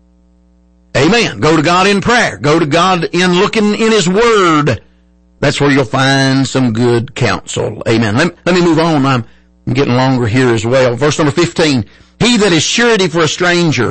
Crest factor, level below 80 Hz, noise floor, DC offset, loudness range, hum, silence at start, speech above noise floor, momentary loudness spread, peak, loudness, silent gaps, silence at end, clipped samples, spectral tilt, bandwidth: 10 dB; -40 dBFS; -48 dBFS; under 0.1%; 3 LU; none; 0.95 s; 37 dB; 6 LU; -2 dBFS; -11 LUFS; none; 0 s; under 0.1%; -5 dB/octave; 8.8 kHz